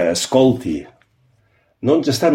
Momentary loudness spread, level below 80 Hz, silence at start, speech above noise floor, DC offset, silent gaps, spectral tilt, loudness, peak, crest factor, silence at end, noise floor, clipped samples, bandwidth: 11 LU; -52 dBFS; 0 s; 44 dB; under 0.1%; none; -5 dB/octave; -17 LUFS; -2 dBFS; 16 dB; 0 s; -60 dBFS; under 0.1%; 16.5 kHz